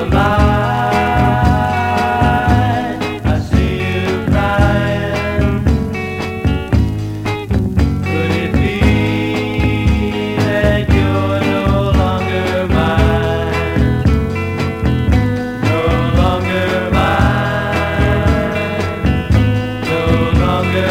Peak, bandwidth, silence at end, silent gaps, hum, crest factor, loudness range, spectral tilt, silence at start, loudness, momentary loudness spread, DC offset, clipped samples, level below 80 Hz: 0 dBFS; 16 kHz; 0 s; none; none; 14 dB; 2 LU; -7 dB/octave; 0 s; -15 LUFS; 5 LU; under 0.1%; under 0.1%; -22 dBFS